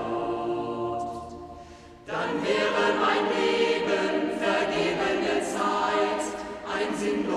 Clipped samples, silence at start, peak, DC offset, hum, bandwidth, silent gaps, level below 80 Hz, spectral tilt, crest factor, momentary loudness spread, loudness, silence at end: under 0.1%; 0 s; -10 dBFS; under 0.1%; none; 13 kHz; none; -56 dBFS; -4 dB/octave; 16 dB; 12 LU; -26 LUFS; 0 s